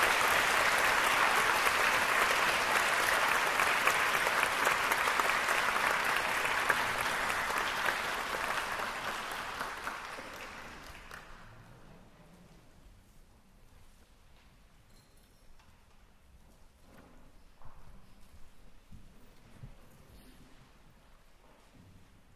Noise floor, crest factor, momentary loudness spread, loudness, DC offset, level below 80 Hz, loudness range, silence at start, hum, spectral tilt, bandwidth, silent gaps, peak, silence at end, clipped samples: -60 dBFS; 24 dB; 16 LU; -29 LUFS; under 0.1%; -58 dBFS; 17 LU; 0 s; none; -1 dB/octave; 16 kHz; none; -10 dBFS; 0.45 s; under 0.1%